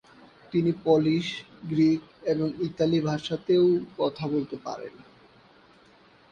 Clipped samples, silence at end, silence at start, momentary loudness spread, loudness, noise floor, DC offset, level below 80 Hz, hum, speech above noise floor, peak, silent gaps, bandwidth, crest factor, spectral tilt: under 0.1%; 1.4 s; 0.5 s; 13 LU; -26 LUFS; -57 dBFS; under 0.1%; -62 dBFS; none; 31 dB; -8 dBFS; none; 7.4 kHz; 18 dB; -7.5 dB/octave